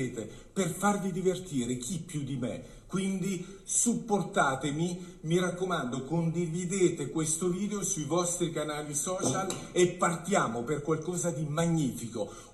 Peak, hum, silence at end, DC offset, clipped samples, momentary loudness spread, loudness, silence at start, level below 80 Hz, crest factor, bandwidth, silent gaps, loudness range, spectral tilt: -12 dBFS; none; 0 s; under 0.1%; under 0.1%; 8 LU; -31 LUFS; 0 s; -56 dBFS; 18 dB; 14 kHz; none; 2 LU; -4.5 dB/octave